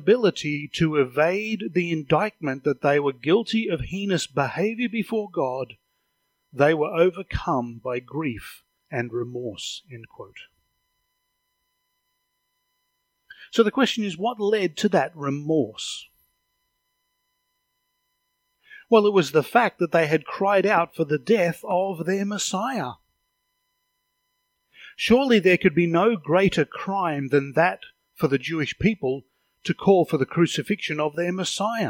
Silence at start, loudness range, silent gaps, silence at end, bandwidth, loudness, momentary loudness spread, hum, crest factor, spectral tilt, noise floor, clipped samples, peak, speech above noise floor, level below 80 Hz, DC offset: 0 s; 10 LU; none; 0 s; 17 kHz; -23 LUFS; 11 LU; none; 20 dB; -5.5 dB/octave; -75 dBFS; under 0.1%; -4 dBFS; 52 dB; -54 dBFS; under 0.1%